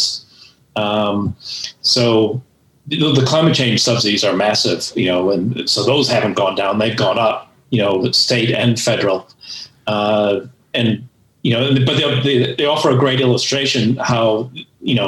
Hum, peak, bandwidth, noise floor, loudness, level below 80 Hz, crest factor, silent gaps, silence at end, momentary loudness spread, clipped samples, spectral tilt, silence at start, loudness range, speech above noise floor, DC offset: none; -2 dBFS; 14.5 kHz; -47 dBFS; -16 LUFS; -60 dBFS; 16 dB; none; 0 s; 10 LU; under 0.1%; -4.5 dB/octave; 0 s; 3 LU; 31 dB; under 0.1%